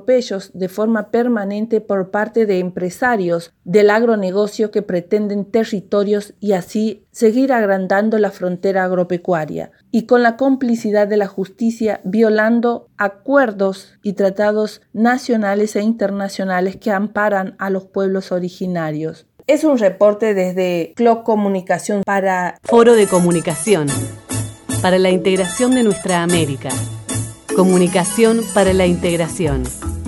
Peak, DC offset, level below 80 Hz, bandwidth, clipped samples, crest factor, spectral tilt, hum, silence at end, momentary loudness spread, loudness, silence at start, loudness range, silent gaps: 0 dBFS; under 0.1%; -42 dBFS; 19 kHz; under 0.1%; 16 dB; -5.5 dB/octave; none; 0 s; 9 LU; -17 LUFS; 0.1 s; 3 LU; none